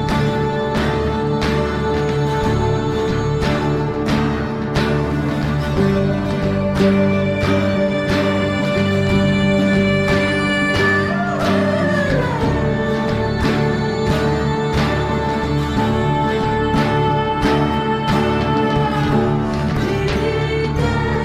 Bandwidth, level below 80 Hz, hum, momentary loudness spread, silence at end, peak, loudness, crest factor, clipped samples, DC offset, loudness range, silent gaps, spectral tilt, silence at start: 13 kHz; -30 dBFS; none; 4 LU; 0 s; -4 dBFS; -17 LUFS; 12 dB; under 0.1%; under 0.1%; 2 LU; none; -7 dB/octave; 0 s